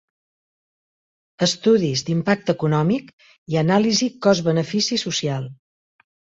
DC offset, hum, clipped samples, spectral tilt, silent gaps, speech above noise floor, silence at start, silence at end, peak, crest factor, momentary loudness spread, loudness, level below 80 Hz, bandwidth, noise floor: under 0.1%; none; under 0.1%; -5 dB/octave; 3.13-3.18 s, 3.38-3.46 s; over 70 dB; 1.4 s; 0.85 s; -4 dBFS; 18 dB; 8 LU; -20 LUFS; -60 dBFS; 8 kHz; under -90 dBFS